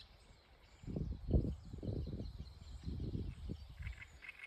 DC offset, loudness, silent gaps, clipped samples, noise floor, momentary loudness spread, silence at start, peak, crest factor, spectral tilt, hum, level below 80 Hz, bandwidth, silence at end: under 0.1%; -45 LUFS; none; under 0.1%; -64 dBFS; 23 LU; 0 s; -22 dBFS; 22 dB; -8 dB/octave; none; -48 dBFS; 9 kHz; 0 s